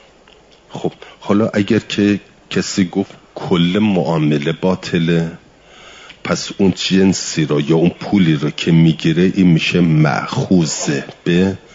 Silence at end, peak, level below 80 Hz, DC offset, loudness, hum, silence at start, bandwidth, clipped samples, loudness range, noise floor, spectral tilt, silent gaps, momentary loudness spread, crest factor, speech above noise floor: 0.15 s; -2 dBFS; -50 dBFS; under 0.1%; -15 LUFS; none; 0.7 s; 7.8 kHz; under 0.1%; 4 LU; -46 dBFS; -6 dB/octave; none; 10 LU; 14 dB; 32 dB